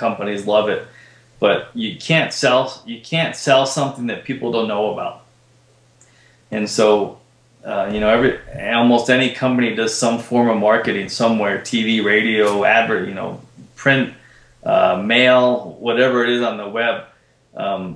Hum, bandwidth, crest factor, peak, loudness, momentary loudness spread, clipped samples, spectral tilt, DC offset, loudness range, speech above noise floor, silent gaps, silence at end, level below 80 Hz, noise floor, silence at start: none; 11 kHz; 18 dB; 0 dBFS; -17 LUFS; 12 LU; under 0.1%; -4.5 dB/octave; under 0.1%; 5 LU; 36 dB; none; 0 s; -52 dBFS; -53 dBFS; 0 s